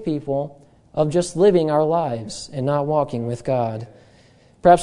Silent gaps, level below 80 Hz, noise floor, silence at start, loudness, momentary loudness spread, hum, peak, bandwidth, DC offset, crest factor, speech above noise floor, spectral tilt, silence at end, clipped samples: none; -50 dBFS; -52 dBFS; 0 s; -21 LUFS; 14 LU; none; -2 dBFS; 11 kHz; under 0.1%; 20 dB; 32 dB; -6.5 dB/octave; 0 s; under 0.1%